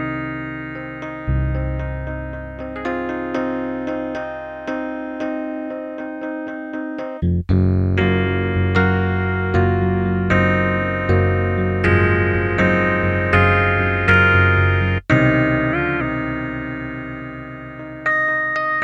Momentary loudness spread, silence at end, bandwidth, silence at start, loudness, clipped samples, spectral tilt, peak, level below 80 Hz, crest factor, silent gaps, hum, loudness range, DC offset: 14 LU; 0 s; 7.2 kHz; 0 s; -19 LUFS; under 0.1%; -8.5 dB/octave; -2 dBFS; -34 dBFS; 16 dB; none; none; 10 LU; under 0.1%